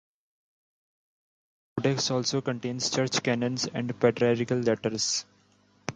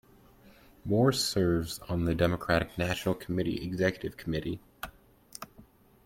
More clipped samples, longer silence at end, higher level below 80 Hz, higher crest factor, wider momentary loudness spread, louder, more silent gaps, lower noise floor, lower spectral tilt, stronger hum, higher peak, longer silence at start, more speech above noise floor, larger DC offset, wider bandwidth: neither; second, 0 s vs 0.4 s; second, -68 dBFS vs -52 dBFS; about the same, 20 dB vs 20 dB; second, 6 LU vs 19 LU; first, -27 LUFS vs -30 LUFS; neither; first, -63 dBFS vs -57 dBFS; second, -4 dB/octave vs -5.5 dB/octave; first, 50 Hz at -55 dBFS vs none; first, -8 dBFS vs -12 dBFS; first, 1.75 s vs 0.85 s; first, 36 dB vs 28 dB; neither; second, 9.6 kHz vs 16.5 kHz